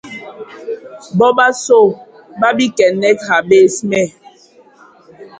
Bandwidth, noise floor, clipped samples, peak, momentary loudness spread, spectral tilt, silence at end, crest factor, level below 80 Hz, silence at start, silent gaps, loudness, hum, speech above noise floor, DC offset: 9.4 kHz; -46 dBFS; under 0.1%; 0 dBFS; 20 LU; -4.5 dB/octave; 0.1 s; 14 dB; -58 dBFS; 0.05 s; none; -12 LUFS; none; 33 dB; under 0.1%